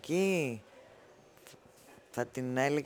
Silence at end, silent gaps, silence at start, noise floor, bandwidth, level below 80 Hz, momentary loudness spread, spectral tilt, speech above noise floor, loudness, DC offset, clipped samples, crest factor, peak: 0 s; none; 0.05 s; -59 dBFS; over 20 kHz; -76 dBFS; 25 LU; -5.5 dB/octave; 27 dB; -34 LUFS; under 0.1%; under 0.1%; 20 dB; -16 dBFS